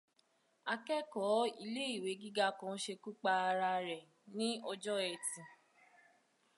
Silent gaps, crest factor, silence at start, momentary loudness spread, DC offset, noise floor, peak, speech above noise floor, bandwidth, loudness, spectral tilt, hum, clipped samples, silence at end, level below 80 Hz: none; 18 dB; 0.65 s; 10 LU; under 0.1%; -76 dBFS; -22 dBFS; 38 dB; 11.5 kHz; -38 LUFS; -3 dB/octave; none; under 0.1%; 1.05 s; under -90 dBFS